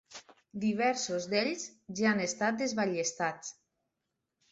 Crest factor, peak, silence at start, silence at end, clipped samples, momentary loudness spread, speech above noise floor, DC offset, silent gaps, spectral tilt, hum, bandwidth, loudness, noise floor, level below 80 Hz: 18 dB; -16 dBFS; 0.1 s; 1 s; under 0.1%; 16 LU; 54 dB; under 0.1%; none; -3.5 dB/octave; none; 8 kHz; -32 LUFS; -85 dBFS; -74 dBFS